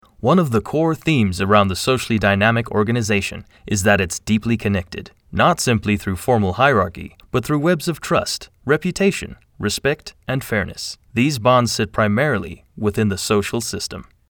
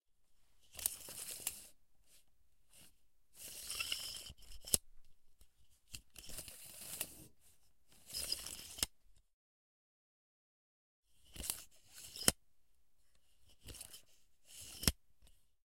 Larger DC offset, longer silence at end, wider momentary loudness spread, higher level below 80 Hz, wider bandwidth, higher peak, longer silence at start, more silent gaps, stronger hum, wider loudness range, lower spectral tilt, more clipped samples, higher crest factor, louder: neither; first, 0.3 s vs 0 s; second, 11 LU vs 21 LU; first, -46 dBFS vs -60 dBFS; first, over 20 kHz vs 16.5 kHz; first, -2 dBFS vs -6 dBFS; first, 0.25 s vs 0 s; second, none vs 9.33-11.03 s; neither; about the same, 3 LU vs 5 LU; first, -5 dB/octave vs -1.5 dB/octave; neither; second, 18 dB vs 40 dB; first, -19 LUFS vs -41 LUFS